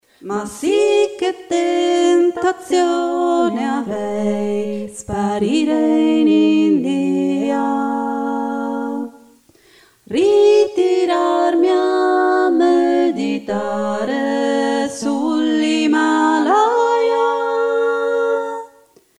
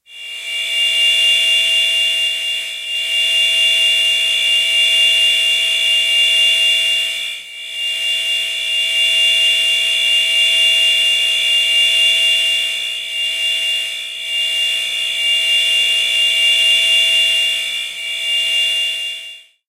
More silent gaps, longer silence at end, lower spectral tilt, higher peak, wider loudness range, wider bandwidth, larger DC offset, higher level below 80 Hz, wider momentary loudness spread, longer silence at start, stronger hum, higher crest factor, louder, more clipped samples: neither; first, 0.55 s vs 0.3 s; first, -5 dB/octave vs 4.5 dB/octave; about the same, -2 dBFS vs -4 dBFS; about the same, 4 LU vs 3 LU; second, 11.5 kHz vs 16 kHz; neither; first, -58 dBFS vs -70 dBFS; about the same, 8 LU vs 10 LU; about the same, 0.2 s vs 0.1 s; neither; about the same, 14 dB vs 12 dB; second, -17 LUFS vs -12 LUFS; neither